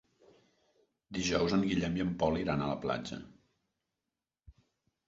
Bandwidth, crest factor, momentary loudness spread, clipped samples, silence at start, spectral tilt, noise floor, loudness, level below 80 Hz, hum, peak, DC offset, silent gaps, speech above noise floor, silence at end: 7.6 kHz; 20 dB; 12 LU; under 0.1%; 1.1 s; -5 dB/octave; under -90 dBFS; -33 LUFS; -56 dBFS; none; -16 dBFS; under 0.1%; none; over 58 dB; 0.55 s